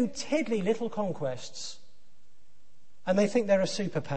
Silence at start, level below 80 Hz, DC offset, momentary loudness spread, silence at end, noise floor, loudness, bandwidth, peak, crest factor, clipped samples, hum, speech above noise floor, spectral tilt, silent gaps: 0 s; -66 dBFS; 1%; 14 LU; 0 s; -68 dBFS; -29 LUFS; 8.8 kHz; -12 dBFS; 18 dB; under 0.1%; none; 39 dB; -5.5 dB/octave; none